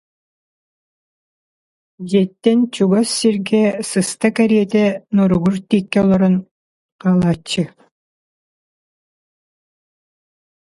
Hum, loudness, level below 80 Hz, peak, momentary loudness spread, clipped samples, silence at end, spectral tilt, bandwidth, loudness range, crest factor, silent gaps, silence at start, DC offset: none; -16 LUFS; -52 dBFS; 0 dBFS; 6 LU; under 0.1%; 2.95 s; -6 dB/octave; 11.5 kHz; 8 LU; 18 dB; 6.51-6.99 s; 2 s; under 0.1%